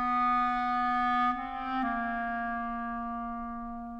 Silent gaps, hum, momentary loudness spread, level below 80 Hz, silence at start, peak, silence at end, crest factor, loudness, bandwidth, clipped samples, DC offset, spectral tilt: none; none; 10 LU; -52 dBFS; 0 s; -18 dBFS; 0 s; 12 dB; -31 LUFS; 7.6 kHz; under 0.1%; under 0.1%; -6 dB/octave